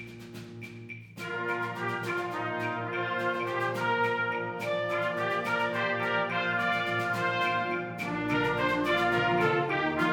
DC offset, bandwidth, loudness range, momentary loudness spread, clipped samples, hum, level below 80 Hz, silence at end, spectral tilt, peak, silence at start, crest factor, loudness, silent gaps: under 0.1%; 19 kHz; 4 LU; 12 LU; under 0.1%; none; -62 dBFS; 0 s; -5.5 dB/octave; -12 dBFS; 0 s; 18 dB; -29 LUFS; none